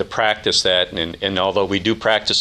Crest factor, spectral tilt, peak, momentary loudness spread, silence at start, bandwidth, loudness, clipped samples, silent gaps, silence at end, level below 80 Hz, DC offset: 16 dB; -3 dB/octave; -2 dBFS; 6 LU; 0 s; 12.5 kHz; -18 LUFS; under 0.1%; none; 0 s; -48 dBFS; under 0.1%